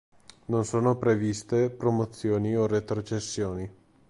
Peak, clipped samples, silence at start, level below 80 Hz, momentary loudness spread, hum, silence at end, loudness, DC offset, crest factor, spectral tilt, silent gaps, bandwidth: -12 dBFS; under 0.1%; 0.5 s; -54 dBFS; 7 LU; none; 0.4 s; -27 LUFS; under 0.1%; 16 dB; -6.5 dB/octave; none; 11.5 kHz